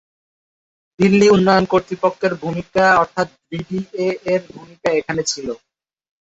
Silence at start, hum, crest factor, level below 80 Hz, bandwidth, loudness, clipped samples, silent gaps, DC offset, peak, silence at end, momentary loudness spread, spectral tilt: 1 s; none; 16 dB; -52 dBFS; 8 kHz; -17 LUFS; under 0.1%; none; under 0.1%; -2 dBFS; 0.65 s; 13 LU; -5 dB/octave